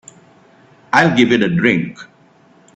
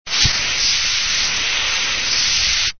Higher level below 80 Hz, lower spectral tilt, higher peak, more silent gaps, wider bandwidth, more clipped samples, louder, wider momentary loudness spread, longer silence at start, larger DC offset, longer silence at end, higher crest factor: second, -54 dBFS vs -36 dBFS; first, -6 dB/octave vs 0.5 dB/octave; about the same, 0 dBFS vs -2 dBFS; neither; first, 8.2 kHz vs 6.8 kHz; neither; about the same, -14 LUFS vs -15 LUFS; first, 7 LU vs 2 LU; first, 0.95 s vs 0.05 s; second, under 0.1% vs 2%; first, 0.7 s vs 0 s; about the same, 18 dB vs 16 dB